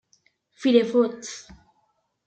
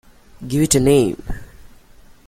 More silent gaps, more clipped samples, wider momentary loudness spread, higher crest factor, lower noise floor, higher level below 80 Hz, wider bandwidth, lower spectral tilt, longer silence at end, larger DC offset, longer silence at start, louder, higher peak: neither; neither; second, 18 LU vs 22 LU; about the same, 20 dB vs 18 dB; first, -70 dBFS vs -45 dBFS; second, -64 dBFS vs -36 dBFS; second, 8.8 kHz vs 16 kHz; about the same, -4.5 dB/octave vs -5 dB/octave; about the same, 0.85 s vs 0.85 s; neither; first, 0.6 s vs 0.4 s; second, -22 LUFS vs -16 LUFS; second, -6 dBFS vs -2 dBFS